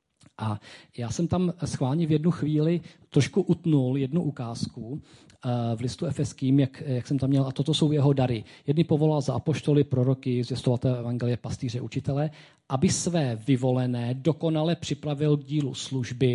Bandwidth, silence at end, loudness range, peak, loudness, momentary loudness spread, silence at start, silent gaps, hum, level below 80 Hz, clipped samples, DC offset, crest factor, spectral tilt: 11.5 kHz; 0 s; 3 LU; -10 dBFS; -26 LUFS; 9 LU; 0.4 s; none; none; -54 dBFS; under 0.1%; under 0.1%; 16 dB; -6.5 dB/octave